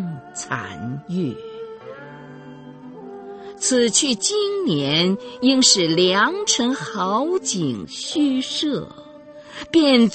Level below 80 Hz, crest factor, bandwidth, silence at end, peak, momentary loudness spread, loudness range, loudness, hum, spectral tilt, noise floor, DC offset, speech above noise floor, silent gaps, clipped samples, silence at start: -60 dBFS; 20 dB; 8.8 kHz; 0 s; -2 dBFS; 23 LU; 12 LU; -19 LUFS; none; -3 dB/octave; -41 dBFS; under 0.1%; 22 dB; none; under 0.1%; 0 s